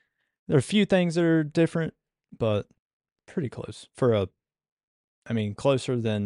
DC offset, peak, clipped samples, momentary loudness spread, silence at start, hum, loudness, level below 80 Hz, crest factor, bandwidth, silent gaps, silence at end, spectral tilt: under 0.1%; -10 dBFS; under 0.1%; 12 LU; 0.5 s; none; -26 LUFS; -60 dBFS; 18 dB; 11.5 kHz; 2.80-3.00 s, 3.12-3.16 s, 4.72-4.77 s, 4.83-5.22 s; 0 s; -6.5 dB/octave